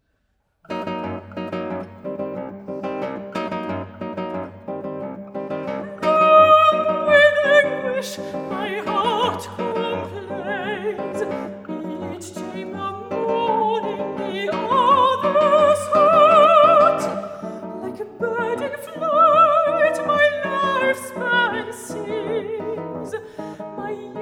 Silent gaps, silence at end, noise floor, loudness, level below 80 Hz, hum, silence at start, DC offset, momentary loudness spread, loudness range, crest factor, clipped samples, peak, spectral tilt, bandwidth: none; 0 s; -68 dBFS; -19 LUFS; -66 dBFS; none; 0.7 s; under 0.1%; 18 LU; 13 LU; 18 dB; under 0.1%; -2 dBFS; -4.5 dB/octave; 15.5 kHz